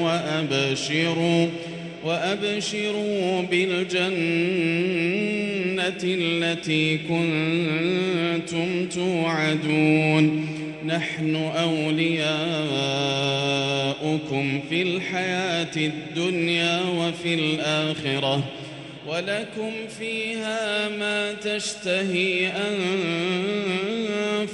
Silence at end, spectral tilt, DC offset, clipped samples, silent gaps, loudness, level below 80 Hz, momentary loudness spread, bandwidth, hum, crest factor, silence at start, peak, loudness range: 0 s; -5 dB/octave; under 0.1%; under 0.1%; none; -24 LUFS; -64 dBFS; 5 LU; 11.5 kHz; none; 16 dB; 0 s; -8 dBFS; 3 LU